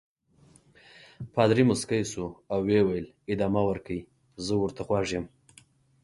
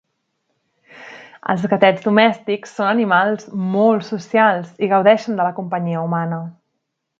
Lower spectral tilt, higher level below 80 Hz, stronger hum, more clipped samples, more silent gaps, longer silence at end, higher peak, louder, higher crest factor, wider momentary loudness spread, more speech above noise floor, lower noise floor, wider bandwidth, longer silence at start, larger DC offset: about the same, -6 dB/octave vs -7 dB/octave; first, -54 dBFS vs -68 dBFS; neither; neither; neither; about the same, 0.75 s vs 0.7 s; second, -8 dBFS vs 0 dBFS; second, -28 LUFS vs -17 LUFS; about the same, 22 dB vs 18 dB; about the same, 14 LU vs 12 LU; second, 33 dB vs 58 dB; second, -60 dBFS vs -75 dBFS; first, 11.5 kHz vs 7.6 kHz; first, 1.2 s vs 0.95 s; neither